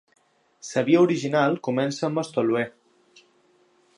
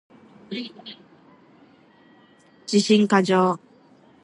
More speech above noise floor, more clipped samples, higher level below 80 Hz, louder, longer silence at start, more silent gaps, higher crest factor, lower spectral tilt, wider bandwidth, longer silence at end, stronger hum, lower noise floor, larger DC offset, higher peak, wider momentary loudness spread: first, 40 dB vs 34 dB; neither; about the same, -76 dBFS vs -74 dBFS; about the same, -23 LUFS vs -21 LUFS; first, 0.65 s vs 0.5 s; neither; about the same, 18 dB vs 20 dB; about the same, -6 dB/octave vs -5 dB/octave; about the same, 10.5 kHz vs 10.5 kHz; first, 1.3 s vs 0.65 s; neither; first, -62 dBFS vs -54 dBFS; neither; about the same, -6 dBFS vs -6 dBFS; second, 9 LU vs 23 LU